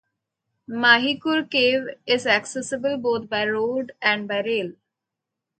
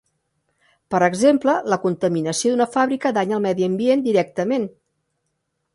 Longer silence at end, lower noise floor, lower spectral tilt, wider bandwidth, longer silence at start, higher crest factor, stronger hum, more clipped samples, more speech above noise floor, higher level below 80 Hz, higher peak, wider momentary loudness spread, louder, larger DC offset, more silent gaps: second, 0.9 s vs 1.05 s; first, -84 dBFS vs -74 dBFS; second, -3 dB/octave vs -5 dB/octave; second, 9.2 kHz vs 11.5 kHz; second, 0.7 s vs 0.9 s; about the same, 22 dB vs 18 dB; neither; neither; first, 62 dB vs 55 dB; second, -70 dBFS vs -64 dBFS; first, 0 dBFS vs -4 dBFS; first, 10 LU vs 6 LU; about the same, -21 LUFS vs -20 LUFS; neither; neither